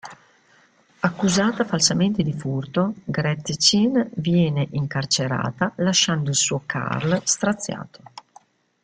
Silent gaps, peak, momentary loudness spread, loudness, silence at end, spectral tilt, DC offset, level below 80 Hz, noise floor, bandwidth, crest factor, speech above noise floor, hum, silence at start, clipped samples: none; -4 dBFS; 8 LU; -21 LUFS; 0.65 s; -4 dB/octave; under 0.1%; -56 dBFS; -57 dBFS; 9.6 kHz; 20 dB; 36 dB; none; 0.05 s; under 0.1%